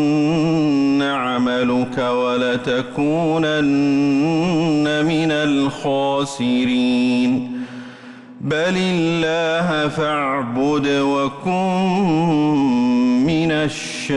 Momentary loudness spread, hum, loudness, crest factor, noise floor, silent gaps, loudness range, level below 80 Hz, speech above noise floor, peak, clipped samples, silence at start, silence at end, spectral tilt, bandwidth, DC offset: 4 LU; none; -18 LUFS; 8 dB; -38 dBFS; none; 2 LU; -52 dBFS; 21 dB; -10 dBFS; under 0.1%; 0 s; 0 s; -6 dB/octave; 11.5 kHz; under 0.1%